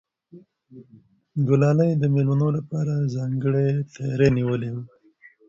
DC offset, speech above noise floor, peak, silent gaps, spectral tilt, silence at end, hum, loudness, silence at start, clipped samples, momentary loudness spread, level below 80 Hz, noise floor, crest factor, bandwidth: under 0.1%; 33 dB; -6 dBFS; none; -9 dB/octave; 0.6 s; none; -22 LUFS; 0.35 s; under 0.1%; 9 LU; -54 dBFS; -54 dBFS; 18 dB; 7.4 kHz